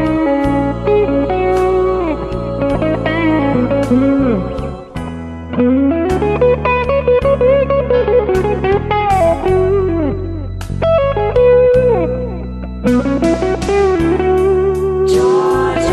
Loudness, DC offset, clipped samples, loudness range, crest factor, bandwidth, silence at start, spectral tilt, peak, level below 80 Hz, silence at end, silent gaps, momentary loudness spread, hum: -14 LUFS; under 0.1%; under 0.1%; 2 LU; 12 dB; 12.5 kHz; 0 s; -7.5 dB/octave; 0 dBFS; -28 dBFS; 0 s; none; 10 LU; none